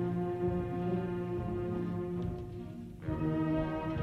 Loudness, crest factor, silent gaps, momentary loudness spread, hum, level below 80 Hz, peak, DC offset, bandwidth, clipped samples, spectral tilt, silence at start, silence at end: -36 LUFS; 14 dB; none; 10 LU; none; -50 dBFS; -22 dBFS; under 0.1%; 6.2 kHz; under 0.1%; -9.5 dB/octave; 0 s; 0 s